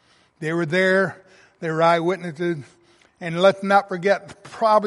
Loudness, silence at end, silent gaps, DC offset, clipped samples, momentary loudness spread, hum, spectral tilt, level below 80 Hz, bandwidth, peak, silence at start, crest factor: -21 LUFS; 0 s; none; under 0.1%; under 0.1%; 13 LU; none; -6 dB/octave; -70 dBFS; 11.5 kHz; -2 dBFS; 0.4 s; 18 dB